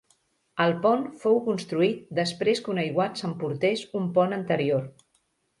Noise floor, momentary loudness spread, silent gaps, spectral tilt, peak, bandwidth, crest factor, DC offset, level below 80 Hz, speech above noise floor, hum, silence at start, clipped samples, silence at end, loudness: -71 dBFS; 5 LU; none; -6 dB/octave; -8 dBFS; 11.5 kHz; 18 dB; under 0.1%; -70 dBFS; 46 dB; none; 0.55 s; under 0.1%; 0.7 s; -26 LUFS